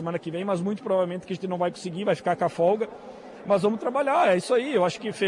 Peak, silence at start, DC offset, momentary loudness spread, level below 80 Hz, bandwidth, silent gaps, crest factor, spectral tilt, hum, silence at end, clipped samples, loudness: -10 dBFS; 0 s; under 0.1%; 10 LU; -70 dBFS; 11.5 kHz; none; 14 dB; -6 dB/octave; none; 0 s; under 0.1%; -25 LUFS